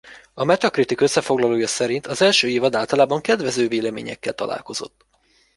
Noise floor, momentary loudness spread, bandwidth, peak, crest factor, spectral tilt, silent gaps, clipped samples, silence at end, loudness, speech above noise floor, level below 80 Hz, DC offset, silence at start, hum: -61 dBFS; 12 LU; 11.5 kHz; -2 dBFS; 18 dB; -3.5 dB/octave; none; under 0.1%; 0.7 s; -20 LUFS; 41 dB; -60 dBFS; under 0.1%; 0.05 s; none